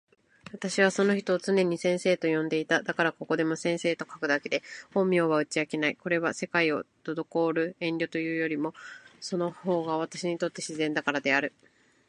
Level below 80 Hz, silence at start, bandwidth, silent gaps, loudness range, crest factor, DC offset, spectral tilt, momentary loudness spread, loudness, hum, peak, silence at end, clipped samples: -76 dBFS; 0.55 s; 11.5 kHz; none; 4 LU; 20 dB; under 0.1%; -5 dB/octave; 8 LU; -28 LUFS; none; -8 dBFS; 0.6 s; under 0.1%